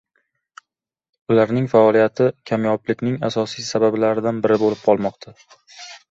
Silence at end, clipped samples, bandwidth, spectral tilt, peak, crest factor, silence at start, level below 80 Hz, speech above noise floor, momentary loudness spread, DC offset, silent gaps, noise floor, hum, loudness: 0.15 s; under 0.1%; 7.8 kHz; -6.5 dB/octave; -2 dBFS; 18 dB; 1.3 s; -60 dBFS; 64 dB; 8 LU; under 0.1%; none; -83 dBFS; none; -19 LUFS